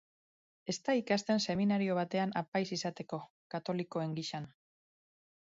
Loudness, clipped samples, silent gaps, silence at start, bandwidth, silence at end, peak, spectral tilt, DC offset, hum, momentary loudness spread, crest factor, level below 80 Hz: -35 LUFS; under 0.1%; 2.48-2.52 s, 3.30-3.50 s; 0.65 s; 7.6 kHz; 1.1 s; -18 dBFS; -4.5 dB/octave; under 0.1%; none; 12 LU; 18 dB; -76 dBFS